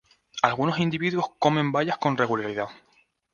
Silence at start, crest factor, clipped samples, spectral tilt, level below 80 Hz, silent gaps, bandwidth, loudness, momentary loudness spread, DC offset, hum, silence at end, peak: 0.35 s; 24 dB; under 0.1%; -6 dB/octave; -64 dBFS; none; 7.2 kHz; -25 LUFS; 8 LU; under 0.1%; none; 0.6 s; -2 dBFS